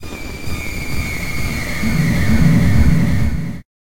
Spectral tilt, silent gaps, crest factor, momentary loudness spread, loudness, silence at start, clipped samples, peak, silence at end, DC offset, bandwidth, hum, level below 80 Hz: -6 dB/octave; none; 14 dB; 13 LU; -17 LUFS; 0 s; under 0.1%; -2 dBFS; 0.15 s; under 0.1%; 17 kHz; none; -24 dBFS